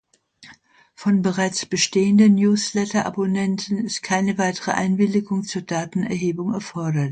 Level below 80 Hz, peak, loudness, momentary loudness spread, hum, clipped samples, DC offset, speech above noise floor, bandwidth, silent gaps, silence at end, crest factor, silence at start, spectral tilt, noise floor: -62 dBFS; -6 dBFS; -21 LUFS; 10 LU; none; under 0.1%; under 0.1%; 31 dB; 9.2 kHz; none; 0 s; 16 dB; 0.4 s; -5 dB/octave; -51 dBFS